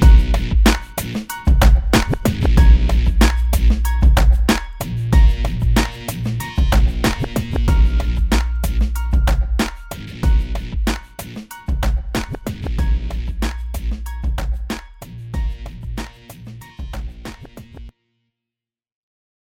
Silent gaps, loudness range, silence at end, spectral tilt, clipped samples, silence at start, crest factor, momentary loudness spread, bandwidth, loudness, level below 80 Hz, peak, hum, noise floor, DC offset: none; 15 LU; 1.55 s; -5.5 dB/octave; under 0.1%; 0 s; 16 dB; 18 LU; 16.5 kHz; -19 LUFS; -18 dBFS; 0 dBFS; none; -87 dBFS; under 0.1%